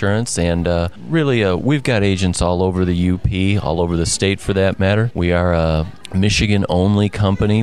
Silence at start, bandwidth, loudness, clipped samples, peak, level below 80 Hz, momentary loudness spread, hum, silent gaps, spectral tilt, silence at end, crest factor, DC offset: 0 s; 12.5 kHz; -17 LUFS; under 0.1%; -2 dBFS; -28 dBFS; 3 LU; none; none; -5.5 dB/octave; 0 s; 14 dB; 1%